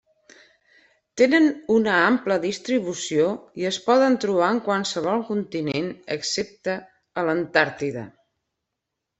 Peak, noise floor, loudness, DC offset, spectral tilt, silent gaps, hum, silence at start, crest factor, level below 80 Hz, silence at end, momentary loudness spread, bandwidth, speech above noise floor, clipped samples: -2 dBFS; -82 dBFS; -22 LUFS; under 0.1%; -4.5 dB/octave; none; none; 1.15 s; 20 dB; -66 dBFS; 1.1 s; 11 LU; 8.4 kHz; 60 dB; under 0.1%